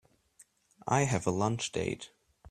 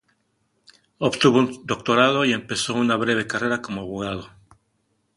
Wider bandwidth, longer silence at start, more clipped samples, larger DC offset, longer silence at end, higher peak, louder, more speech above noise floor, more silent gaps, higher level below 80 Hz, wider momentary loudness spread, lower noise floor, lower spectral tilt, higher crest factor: first, 13.5 kHz vs 11.5 kHz; second, 0.85 s vs 1 s; neither; neither; second, 0.45 s vs 0.9 s; second, -12 dBFS vs -2 dBFS; second, -32 LUFS vs -21 LUFS; second, 33 dB vs 48 dB; neither; second, -62 dBFS vs -56 dBFS; first, 15 LU vs 11 LU; second, -64 dBFS vs -70 dBFS; about the same, -5 dB/octave vs -4.5 dB/octave; about the same, 22 dB vs 22 dB